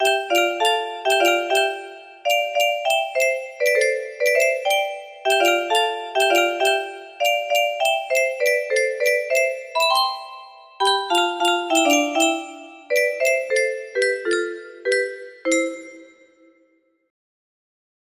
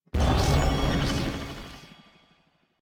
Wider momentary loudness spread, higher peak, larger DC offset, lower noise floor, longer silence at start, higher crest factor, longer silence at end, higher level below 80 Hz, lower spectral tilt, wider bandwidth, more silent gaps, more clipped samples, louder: second, 11 LU vs 19 LU; first, -4 dBFS vs -12 dBFS; neither; second, -62 dBFS vs -66 dBFS; second, 0 s vs 0.15 s; about the same, 16 dB vs 16 dB; first, 2.05 s vs 0.95 s; second, -72 dBFS vs -32 dBFS; second, 0.5 dB/octave vs -5.5 dB/octave; second, 15.5 kHz vs 17.5 kHz; neither; neither; first, -20 LUFS vs -26 LUFS